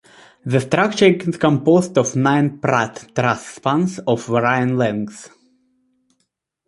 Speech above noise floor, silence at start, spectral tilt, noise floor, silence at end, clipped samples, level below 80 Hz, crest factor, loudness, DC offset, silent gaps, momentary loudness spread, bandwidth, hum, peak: 54 dB; 0.45 s; -6 dB/octave; -71 dBFS; 1.4 s; under 0.1%; -58 dBFS; 18 dB; -18 LUFS; under 0.1%; none; 7 LU; 11.5 kHz; none; 0 dBFS